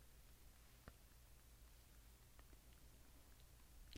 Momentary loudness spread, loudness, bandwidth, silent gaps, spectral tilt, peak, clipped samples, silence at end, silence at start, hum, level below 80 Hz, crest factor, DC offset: 2 LU; -67 LUFS; 17.5 kHz; none; -3.5 dB/octave; -40 dBFS; under 0.1%; 0 s; 0 s; none; -68 dBFS; 24 dB; under 0.1%